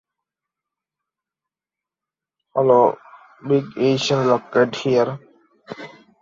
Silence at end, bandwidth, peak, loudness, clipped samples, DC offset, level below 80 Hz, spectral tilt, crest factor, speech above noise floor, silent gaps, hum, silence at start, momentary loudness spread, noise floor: 0.35 s; 7.6 kHz; -2 dBFS; -19 LUFS; under 0.1%; under 0.1%; -66 dBFS; -6 dB/octave; 20 dB; 71 dB; none; none; 2.55 s; 21 LU; -89 dBFS